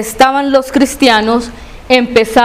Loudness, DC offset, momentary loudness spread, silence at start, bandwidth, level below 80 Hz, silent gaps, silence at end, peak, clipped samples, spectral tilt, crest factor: -10 LUFS; 0.3%; 6 LU; 0 s; 16 kHz; -36 dBFS; none; 0 s; 0 dBFS; 0.9%; -3.5 dB/octave; 10 dB